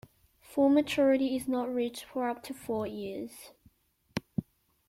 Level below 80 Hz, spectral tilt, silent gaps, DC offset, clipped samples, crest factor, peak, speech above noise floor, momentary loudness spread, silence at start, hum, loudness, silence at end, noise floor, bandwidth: -66 dBFS; -5.5 dB/octave; none; under 0.1%; under 0.1%; 18 dB; -14 dBFS; 36 dB; 15 LU; 0.5 s; none; -31 LUFS; 0.45 s; -66 dBFS; 16 kHz